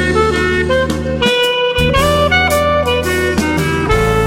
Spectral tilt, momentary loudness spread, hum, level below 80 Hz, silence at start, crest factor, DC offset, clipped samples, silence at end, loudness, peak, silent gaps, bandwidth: -4.5 dB/octave; 4 LU; none; -26 dBFS; 0 s; 12 dB; under 0.1%; under 0.1%; 0 s; -13 LUFS; 0 dBFS; none; 16.5 kHz